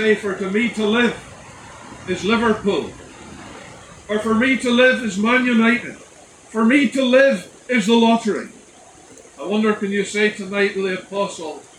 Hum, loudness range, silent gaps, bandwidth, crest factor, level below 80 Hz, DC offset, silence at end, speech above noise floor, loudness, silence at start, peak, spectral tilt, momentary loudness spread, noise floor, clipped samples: none; 5 LU; none; 11 kHz; 16 dB; -54 dBFS; under 0.1%; 0.15 s; 27 dB; -18 LUFS; 0 s; -2 dBFS; -4.5 dB/octave; 22 LU; -45 dBFS; under 0.1%